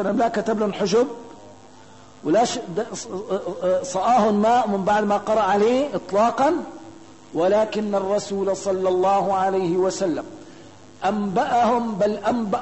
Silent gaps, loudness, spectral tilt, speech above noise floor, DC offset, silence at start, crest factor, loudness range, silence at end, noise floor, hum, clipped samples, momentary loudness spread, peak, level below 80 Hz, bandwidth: none; -21 LUFS; -5 dB/octave; 26 dB; 0.3%; 0 s; 14 dB; 4 LU; 0 s; -47 dBFS; none; under 0.1%; 10 LU; -8 dBFS; -58 dBFS; 8.6 kHz